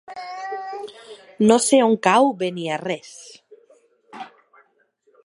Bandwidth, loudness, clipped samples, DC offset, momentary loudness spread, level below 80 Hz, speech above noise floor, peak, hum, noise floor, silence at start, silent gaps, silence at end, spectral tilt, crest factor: 11.5 kHz; -19 LUFS; under 0.1%; under 0.1%; 24 LU; -70 dBFS; 44 dB; -2 dBFS; none; -63 dBFS; 0.1 s; none; 1 s; -4 dB/octave; 20 dB